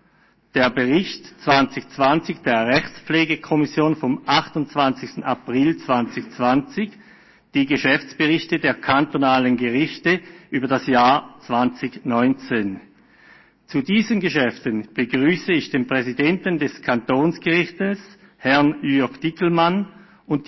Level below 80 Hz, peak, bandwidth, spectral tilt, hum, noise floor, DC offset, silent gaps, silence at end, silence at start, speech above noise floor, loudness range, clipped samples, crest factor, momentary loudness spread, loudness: -56 dBFS; -4 dBFS; 6.2 kHz; -6 dB/octave; none; -58 dBFS; under 0.1%; none; 0.05 s; 0.55 s; 38 dB; 3 LU; under 0.1%; 16 dB; 8 LU; -20 LUFS